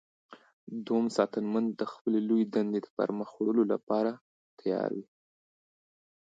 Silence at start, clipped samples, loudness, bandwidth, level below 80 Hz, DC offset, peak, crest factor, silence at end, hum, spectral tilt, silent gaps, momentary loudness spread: 0.3 s; under 0.1%; -31 LUFS; 7.8 kHz; -82 dBFS; under 0.1%; -12 dBFS; 20 dB; 1.35 s; none; -7 dB/octave; 0.53-0.67 s, 2.01-2.05 s, 2.90-2.97 s, 3.83-3.87 s, 4.21-4.57 s; 9 LU